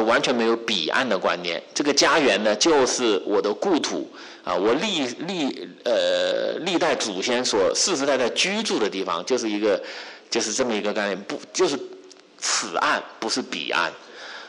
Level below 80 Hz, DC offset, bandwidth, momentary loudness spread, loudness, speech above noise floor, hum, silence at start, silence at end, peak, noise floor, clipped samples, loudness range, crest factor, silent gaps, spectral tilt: -64 dBFS; under 0.1%; 11.5 kHz; 9 LU; -22 LUFS; 23 dB; none; 0 s; 0 s; -10 dBFS; -45 dBFS; under 0.1%; 5 LU; 14 dB; none; -2 dB/octave